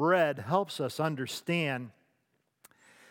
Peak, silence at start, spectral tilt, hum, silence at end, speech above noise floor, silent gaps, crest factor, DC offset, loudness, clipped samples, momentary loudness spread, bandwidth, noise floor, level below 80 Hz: -12 dBFS; 0 s; -5.5 dB/octave; none; 1.2 s; 47 dB; none; 20 dB; under 0.1%; -31 LUFS; under 0.1%; 9 LU; 17 kHz; -77 dBFS; -82 dBFS